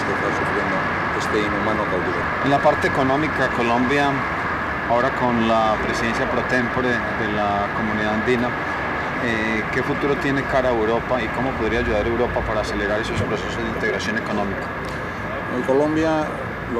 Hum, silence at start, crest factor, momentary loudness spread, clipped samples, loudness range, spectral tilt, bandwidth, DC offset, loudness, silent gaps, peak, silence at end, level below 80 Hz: none; 0 s; 16 dB; 5 LU; under 0.1%; 3 LU; -6 dB/octave; 15 kHz; under 0.1%; -21 LUFS; none; -4 dBFS; 0 s; -38 dBFS